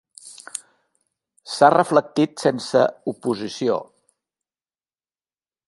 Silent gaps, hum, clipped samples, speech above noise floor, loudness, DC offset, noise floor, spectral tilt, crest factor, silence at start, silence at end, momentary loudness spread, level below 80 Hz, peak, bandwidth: none; none; under 0.1%; over 71 dB; -20 LUFS; under 0.1%; under -90 dBFS; -5 dB/octave; 22 dB; 0.25 s; 1.85 s; 18 LU; -68 dBFS; 0 dBFS; 11.5 kHz